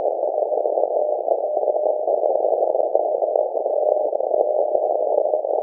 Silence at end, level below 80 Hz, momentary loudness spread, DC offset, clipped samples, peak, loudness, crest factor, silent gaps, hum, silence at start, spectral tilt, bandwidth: 0 s; under -90 dBFS; 2 LU; under 0.1%; under 0.1%; -2 dBFS; -21 LUFS; 18 dB; none; none; 0 s; -10 dB/octave; 1 kHz